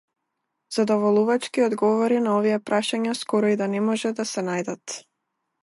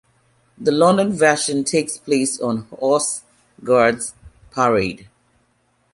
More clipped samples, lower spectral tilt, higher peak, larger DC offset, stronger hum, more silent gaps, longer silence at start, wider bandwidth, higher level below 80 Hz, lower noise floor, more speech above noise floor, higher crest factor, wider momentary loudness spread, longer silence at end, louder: neither; about the same, -5 dB/octave vs -4 dB/octave; second, -10 dBFS vs -2 dBFS; neither; neither; neither; about the same, 0.7 s vs 0.6 s; about the same, 11.5 kHz vs 11.5 kHz; second, -74 dBFS vs -54 dBFS; first, -79 dBFS vs -63 dBFS; first, 57 dB vs 45 dB; about the same, 14 dB vs 18 dB; second, 9 LU vs 13 LU; second, 0.65 s vs 0.9 s; second, -23 LUFS vs -18 LUFS